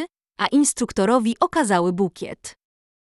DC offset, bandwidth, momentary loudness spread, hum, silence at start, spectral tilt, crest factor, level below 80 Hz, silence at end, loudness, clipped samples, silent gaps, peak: under 0.1%; 11.5 kHz; 15 LU; none; 0 s; -4.5 dB/octave; 18 dB; -56 dBFS; 0.7 s; -20 LUFS; under 0.1%; none; -4 dBFS